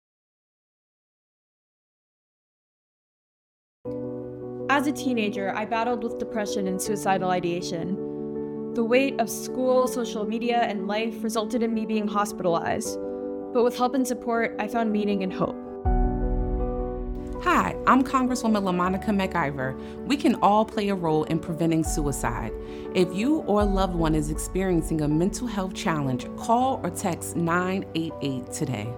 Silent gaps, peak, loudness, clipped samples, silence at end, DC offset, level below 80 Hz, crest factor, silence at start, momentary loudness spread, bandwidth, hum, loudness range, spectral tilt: none; -6 dBFS; -26 LUFS; under 0.1%; 0 s; under 0.1%; -38 dBFS; 20 dB; 3.85 s; 9 LU; 18 kHz; none; 4 LU; -5.5 dB/octave